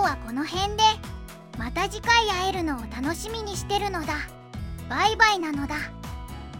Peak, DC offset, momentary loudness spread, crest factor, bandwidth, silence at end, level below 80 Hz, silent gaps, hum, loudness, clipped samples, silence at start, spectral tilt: -4 dBFS; under 0.1%; 18 LU; 22 dB; 17 kHz; 0 s; -40 dBFS; none; none; -25 LUFS; under 0.1%; 0 s; -3.5 dB/octave